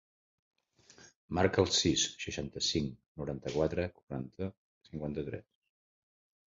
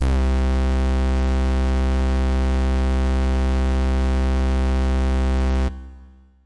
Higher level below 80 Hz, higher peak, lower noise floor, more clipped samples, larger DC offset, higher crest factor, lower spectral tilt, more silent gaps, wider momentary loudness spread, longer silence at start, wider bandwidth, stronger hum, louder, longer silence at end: second, -54 dBFS vs -20 dBFS; about the same, -12 dBFS vs -14 dBFS; first, -61 dBFS vs -46 dBFS; neither; second, under 0.1% vs 1%; first, 24 dB vs 4 dB; second, -4 dB/octave vs -7.5 dB/octave; first, 1.15-1.28 s, 3.06-3.15 s, 4.03-4.07 s, 4.57-4.81 s vs none; first, 15 LU vs 0 LU; first, 1 s vs 0 s; second, 7.4 kHz vs 9.6 kHz; neither; second, -34 LUFS vs -21 LUFS; first, 1.1 s vs 0 s